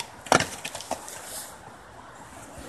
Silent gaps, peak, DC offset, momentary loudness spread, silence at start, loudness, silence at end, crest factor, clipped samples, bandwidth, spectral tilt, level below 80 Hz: none; 0 dBFS; under 0.1%; 22 LU; 0 s; -28 LUFS; 0 s; 30 dB; under 0.1%; 13 kHz; -2.5 dB/octave; -56 dBFS